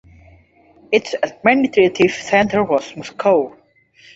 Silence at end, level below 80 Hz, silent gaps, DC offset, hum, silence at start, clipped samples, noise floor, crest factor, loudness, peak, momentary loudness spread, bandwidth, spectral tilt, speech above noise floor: 0.65 s; -54 dBFS; none; under 0.1%; none; 0.9 s; under 0.1%; -51 dBFS; 18 dB; -17 LUFS; 0 dBFS; 7 LU; 8 kHz; -5 dB/octave; 34 dB